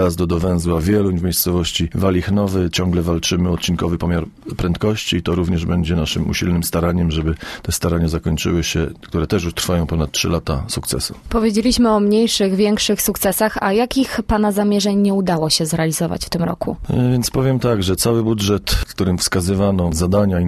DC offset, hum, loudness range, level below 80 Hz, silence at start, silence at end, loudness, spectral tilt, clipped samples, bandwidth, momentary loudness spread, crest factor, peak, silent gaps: under 0.1%; none; 3 LU; -32 dBFS; 0 s; 0 s; -18 LUFS; -5 dB/octave; under 0.1%; 13.5 kHz; 6 LU; 16 dB; -2 dBFS; none